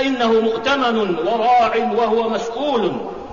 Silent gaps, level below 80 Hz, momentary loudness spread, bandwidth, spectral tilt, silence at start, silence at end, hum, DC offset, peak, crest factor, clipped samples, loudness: none; -52 dBFS; 7 LU; 7.4 kHz; -5 dB/octave; 0 s; 0 s; none; 0.5%; -6 dBFS; 10 dB; under 0.1%; -18 LUFS